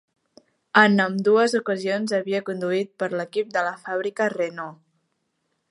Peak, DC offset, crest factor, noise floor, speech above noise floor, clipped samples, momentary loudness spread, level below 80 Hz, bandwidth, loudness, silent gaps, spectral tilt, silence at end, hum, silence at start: -2 dBFS; under 0.1%; 22 dB; -74 dBFS; 52 dB; under 0.1%; 10 LU; -78 dBFS; 11.5 kHz; -22 LUFS; none; -5.5 dB/octave; 0.95 s; none; 0.75 s